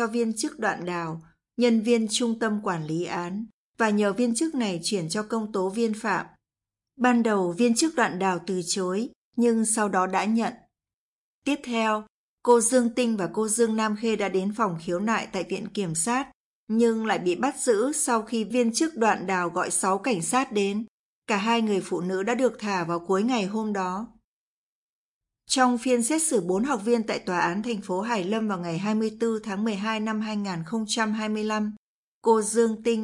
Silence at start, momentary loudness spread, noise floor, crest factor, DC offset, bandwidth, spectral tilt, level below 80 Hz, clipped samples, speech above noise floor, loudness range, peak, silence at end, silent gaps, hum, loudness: 0 s; 8 LU; under -90 dBFS; 18 dB; under 0.1%; 11.5 kHz; -4 dB/octave; -66 dBFS; under 0.1%; over 65 dB; 3 LU; -6 dBFS; 0 s; 3.53-3.74 s, 9.15-9.33 s, 10.94-11.42 s, 12.09-12.38 s, 16.33-16.67 s, 20.88-21.22 s, 24.24-25.21 s, 31.77-32.22 s; none; -25 LUFS